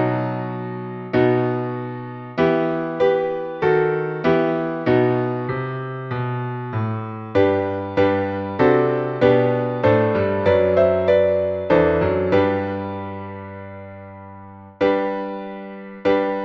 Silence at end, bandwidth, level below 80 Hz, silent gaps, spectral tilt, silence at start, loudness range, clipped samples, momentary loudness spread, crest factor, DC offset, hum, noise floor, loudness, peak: 0 s; 6.2 kHz; -50 dBFS; none; -9 dB/octave; 0 s; 6 LU; under 0.1%; 15 LU; 18 dB; under 0.1%; none; -40 dBFS; -20 LUFS; -2 dBFS